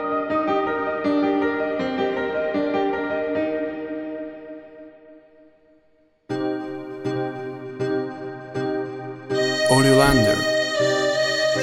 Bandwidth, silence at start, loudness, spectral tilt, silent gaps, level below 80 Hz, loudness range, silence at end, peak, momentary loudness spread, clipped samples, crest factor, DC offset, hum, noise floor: 16.5 kHz; 0 s; -22 LUFS; -5 dB/octave; none; -46 dBFS; 12 LU; 0 s; -2 dBFS; 15 LU; under 0.1%; 20 dB; under 0.1%; none; -60 dBFS